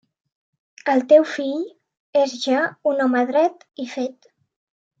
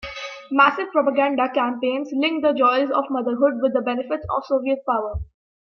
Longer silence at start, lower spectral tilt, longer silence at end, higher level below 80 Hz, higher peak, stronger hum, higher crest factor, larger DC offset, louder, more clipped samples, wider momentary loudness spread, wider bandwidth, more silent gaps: first, 0.85 s vs 0 s; second, -3.5 dB/octave vs -6 dB/octave; first, 0.9 s vs 0.55 s; second, -80 dBFS vs -46 dBFS; about the same, -2 dBFS vs -2 dBFS; neither; about the same, 18 dB vs 18 dB; neither; about the same, -20 LUFS vs -21 LUFS; neither; first, 14 LU vs 9 LU; first, 7.8 kHz vs 6.6 kHz; first, 1.99-2.13 s vs none